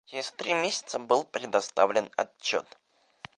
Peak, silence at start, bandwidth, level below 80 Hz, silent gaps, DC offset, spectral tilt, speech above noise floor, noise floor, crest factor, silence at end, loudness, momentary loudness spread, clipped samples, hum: -6 dBFS; 0.1 s; 11.5 kHz; -78 dBFS; none; under 0.1%; -2 dB/octave; 22 dB; -51 dBFS; 22 dB; 0.75 s; -28 LUFS; 8 LU; under 0.1%; none